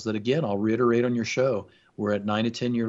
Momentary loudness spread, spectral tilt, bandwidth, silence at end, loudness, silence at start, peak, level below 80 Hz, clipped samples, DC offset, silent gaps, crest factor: 6 LU; -6 dB/octave; 7.8 kHz; 0 s; -25 LUFS; 0 s; -10 dBFS; -66 dBFS; under 0.1%; under 0.1%; none; 14 dB